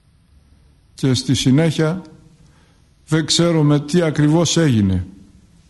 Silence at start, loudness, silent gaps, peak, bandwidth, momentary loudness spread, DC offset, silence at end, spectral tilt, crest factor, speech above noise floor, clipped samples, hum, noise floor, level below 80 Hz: 1 s; -16 LUFS; none; -4 dBFS; 11.5 kHz; 8 LU; under 0.1%; 0.6 s; -5.5 dB/octave; 14 dB; 37 dB; under 0.1%; none; -52 dBFS; -46 dBFS